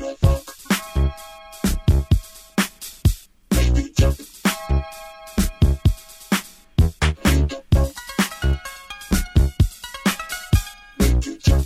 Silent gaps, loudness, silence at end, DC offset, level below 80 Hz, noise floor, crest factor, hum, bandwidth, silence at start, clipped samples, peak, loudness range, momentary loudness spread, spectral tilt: none; -22 LUFS; 0 s; under 0.1%; -24 dBFS; -39 dBFS; 18 dB; none; 16 kHz; 0 s; under 0.1%; -2 dBFS; 2 LU; 8 LU; -5.5 dB/octave